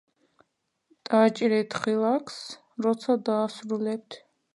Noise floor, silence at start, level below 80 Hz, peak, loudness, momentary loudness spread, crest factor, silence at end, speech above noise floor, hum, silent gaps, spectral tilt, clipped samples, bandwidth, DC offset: -75 dBFS; 1.1 s; -78 dBFS; -8 dBFS; -26 LUFS; 17 LU; 20 dB; 0.4 s; 50 dB; none; none; -5.5 dB/octave; under 0.1%; 11.5 kHz; under 0.1%